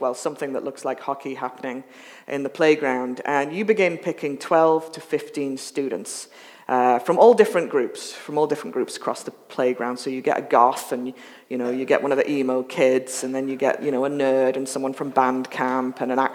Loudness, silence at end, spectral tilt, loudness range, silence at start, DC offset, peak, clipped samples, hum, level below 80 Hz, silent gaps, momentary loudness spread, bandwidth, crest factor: -22 LUFS; 0 s; -4.5 dB/octave; 3 LU; 0 s; under 0.1%; -2 dBFS; under 0.1%; none; -86 dBFS; none; 12 LU; 17 kHz; 22 dB